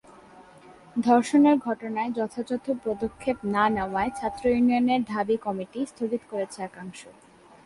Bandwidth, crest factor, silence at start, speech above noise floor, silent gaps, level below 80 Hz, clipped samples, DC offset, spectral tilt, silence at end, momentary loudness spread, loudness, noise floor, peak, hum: 11.5 kHz; 16 dB; 0.35 s; 25 dB; none; -56 dBFS; under 0.1%; under 0.1%; -6 dB/octave; 0.55 s; 13 LU; -25 LUFS; -50 dBFS; -10 dBFS; none